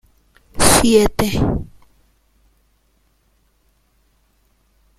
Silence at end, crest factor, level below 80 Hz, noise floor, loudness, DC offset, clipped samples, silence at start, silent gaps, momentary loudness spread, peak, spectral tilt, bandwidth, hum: 3.35 s; 20 dB; -34 dBFS; -61 dBFS; -15 LUFS; under 0.1%; under 0.1%; 0.55 s; none; 14 LU; 0 dBFS; -4 dB/octave; 16.5 kHz; none